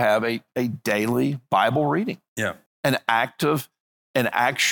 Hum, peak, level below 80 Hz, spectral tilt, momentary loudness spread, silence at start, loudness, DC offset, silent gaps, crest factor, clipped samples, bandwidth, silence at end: none; -2 dBFS; -68 dBFS; -4.5 dB/octave; 8 LU; 0 s; -23 LUFS; under 0.1%; 2.28-2.36 s, 2.66-2.83 s, 3.80-4.14 s; 22 dB; under 0.1%; 17.5 kHz; 0 s